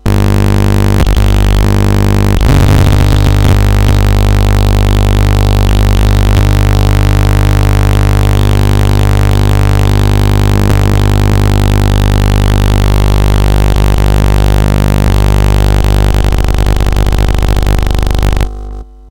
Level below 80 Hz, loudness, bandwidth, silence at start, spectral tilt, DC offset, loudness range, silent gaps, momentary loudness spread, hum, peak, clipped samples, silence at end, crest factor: -10 dBFS; -10 LUFS; 17.5 kHz; 0 s; -6.5 dB/octave; 4%; 2 LU; none; 3 LU; 50 Hz at -10 dBFS; -2 dBFS; under 0.1%; 0 s; 6 dB